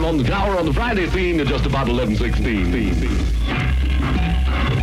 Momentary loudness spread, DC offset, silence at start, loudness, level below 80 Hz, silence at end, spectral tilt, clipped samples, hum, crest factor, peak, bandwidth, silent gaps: 2 LU; under 0.1%; 0 s; -20 LUFS; -22 dBFS; 0 s; -7 dB/octave; under 0.1%; none; 10 dB; -8 dBFS; 12 kHz; none